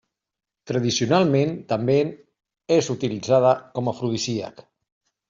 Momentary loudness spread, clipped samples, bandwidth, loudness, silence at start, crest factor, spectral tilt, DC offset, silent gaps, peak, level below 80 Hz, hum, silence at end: 9 LU; under 0.1%; 7.8 kHz; -22 LUFS; 0.65 s; 18 dB; -5.5 dB/octave; under 0.1%; none; -4 dBFS; -62 dBFS; none; 0.8 s